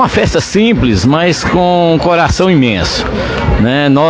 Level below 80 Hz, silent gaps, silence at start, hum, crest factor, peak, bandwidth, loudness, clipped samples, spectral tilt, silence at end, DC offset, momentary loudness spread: -24 dBFS; none; 0 s; none; 10 dB; 0 dBFS; 10 kHz; -10 LUFS; under 0.1%; -5.5 dB/octave; 0 s; under 0.1%; 4 LU